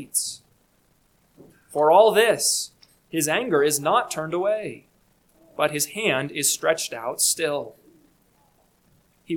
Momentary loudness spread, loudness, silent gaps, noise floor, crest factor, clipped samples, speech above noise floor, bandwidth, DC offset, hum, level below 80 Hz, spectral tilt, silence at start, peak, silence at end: 14 LU; -22 LUFS; none; -63 dBFS; 20 dB; under 0.1%; 41 dB; 19 kHz; under 0.1%; none; -68 dBFS; -2 dB/octave; 0 s; -4 dBFS; 0 s